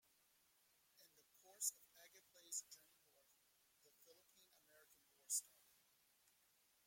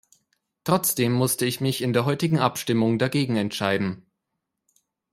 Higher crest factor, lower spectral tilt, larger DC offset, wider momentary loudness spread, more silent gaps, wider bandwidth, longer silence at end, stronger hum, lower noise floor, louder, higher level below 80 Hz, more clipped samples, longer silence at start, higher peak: first, 30 dB vs 20 dB; second, 2.5 dB/octave vs -5 dB/octave; neither; first, 24 LU vs 4 LU; neither; about the same, 16.5 kHz vs 16 kHz; first, 1.4 s vs 1.15 s; neither; about the same, -79 dBFS vs -81 dBFS; second, -47 LUFS vs -23 LUFS; second, under -90 dBFS vs -64 dBFS; neither; first, 1 s vs 0.65 s; second, -28 dBFS vs -6 dBFS